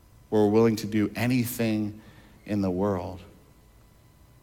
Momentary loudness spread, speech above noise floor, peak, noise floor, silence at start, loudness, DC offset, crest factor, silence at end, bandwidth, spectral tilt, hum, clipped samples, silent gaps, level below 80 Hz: 14 LU; 31 dB; -12 dBFS; -56 dBFS; 0.3 s; -26 LUFS; under 0.1%; 16 dB; 1.15 s; 17.5 kHz; -6.5 dB/octave; none; under 0.1%; none; -58 dBFS